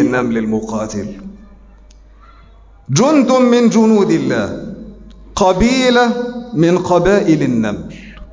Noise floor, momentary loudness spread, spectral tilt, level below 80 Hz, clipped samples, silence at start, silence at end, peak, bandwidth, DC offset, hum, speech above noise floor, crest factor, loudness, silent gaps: -42 dBFS; 17 LU; -5.5 dB/octave; -38 dBFS; under 0.1%; 0 s; 0.05 s; -2 dBFS; 7.6 kHz; under 0.1%; none; 29 dB; 14 dB; -13 LUFS; none